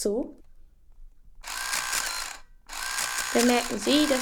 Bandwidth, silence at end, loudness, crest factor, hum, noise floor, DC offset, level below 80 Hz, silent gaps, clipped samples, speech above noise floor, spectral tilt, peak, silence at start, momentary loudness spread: over 20 kHz; 0 s; -26 LUFS; 20 dB; none; -50 dBFS; under 0.1%; -50 dBFS; none; under 0.1%; 26 dB; -1.5 dB/octave; -8 dBFS; 0 s; 17 LU